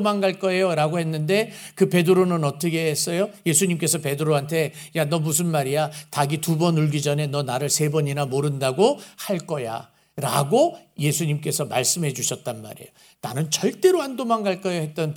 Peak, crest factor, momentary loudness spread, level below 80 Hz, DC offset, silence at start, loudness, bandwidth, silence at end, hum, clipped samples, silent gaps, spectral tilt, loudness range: -4 dBFS; 18 dB; 9 LU; -68 dBFS; under 0.1%; 0 s; -22 LUFS; over 20 kHz; 0 s; none; under 0.1%; none; -4.5 dB/octave; 2 LU